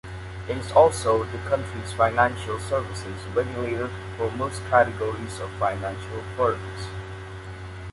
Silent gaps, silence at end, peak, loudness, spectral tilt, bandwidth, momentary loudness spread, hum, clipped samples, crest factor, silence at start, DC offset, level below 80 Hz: none; 0 s; -4 dBFS; -25 LUFS; -5.5 dB/octave; 11.5 kHz; 16 LU; none; under 0.1%; 22 dB; 0.05 s; under 0.1%; -44 dBFS